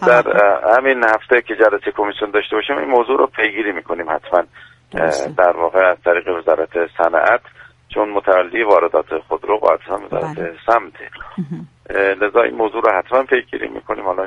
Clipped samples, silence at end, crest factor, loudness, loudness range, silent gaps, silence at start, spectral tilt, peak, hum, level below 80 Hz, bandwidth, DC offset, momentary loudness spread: under 0.1%; 0 s; 16 dB; -16 LUFS; 3 LU; none; 0 s; -5.5 dB/octave; 0 dBFS; none; -52 dBFS; 11 kHz; under 0.1%; 11 LU